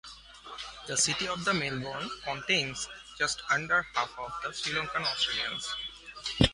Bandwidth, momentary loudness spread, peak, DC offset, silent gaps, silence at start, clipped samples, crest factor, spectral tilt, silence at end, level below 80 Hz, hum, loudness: 11.5 kHz; 13 LU; -8 dBFS; under 0.1%; none; 0.05 s; under 0.1%; 24 dB; -2.5 dB/octave; 0 s; -50 dBFS; none; -30 LUFS